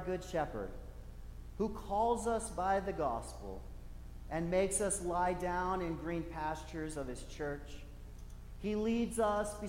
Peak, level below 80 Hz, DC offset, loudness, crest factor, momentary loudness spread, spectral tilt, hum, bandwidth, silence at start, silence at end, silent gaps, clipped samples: -22 dBFS; -48 dBFS; under 0.1%; -37 LUFS; 16 dB; 19 LU; -5 dB/octave; 60 Hz at -50 dBFS; 16.5 kHz; 0 s; 0 s; none; under 0.1%